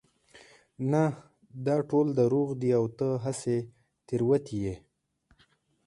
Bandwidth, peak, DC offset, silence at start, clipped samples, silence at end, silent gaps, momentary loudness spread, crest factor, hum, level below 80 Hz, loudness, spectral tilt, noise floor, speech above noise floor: 11.5 kHz; -12 dBFS; under 0.1%; 0.35 s; under 0.1%; 1.1 s; none; 11 LU; 18 dB; none; -62 dBFS; -29 LUFS; -8 dB/octave; -69 dBFS; 41 dB